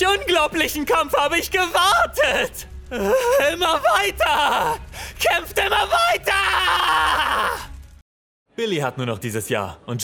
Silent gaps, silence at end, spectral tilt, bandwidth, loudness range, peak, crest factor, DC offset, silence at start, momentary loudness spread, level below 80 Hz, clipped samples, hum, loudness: 8.02-8.46 s; 0 s; -3 dB/octave; over 20 kHz; 2 LU; -6 dBFS; 14 dB; under 0.1%; 0 s; 10 LU; -42 dBFS; under 0.1%; none; -19 LUFS